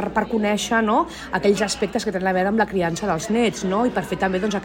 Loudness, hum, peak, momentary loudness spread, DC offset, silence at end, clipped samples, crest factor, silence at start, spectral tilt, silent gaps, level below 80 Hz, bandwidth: -21 LUFS; none; -6 dBFS; 3 LU; under 0.1%; 0 s; under 0.1%; 16 dB; 0 s; -4.5 dB/octave; none; -46 dBFS; 16.5 kHz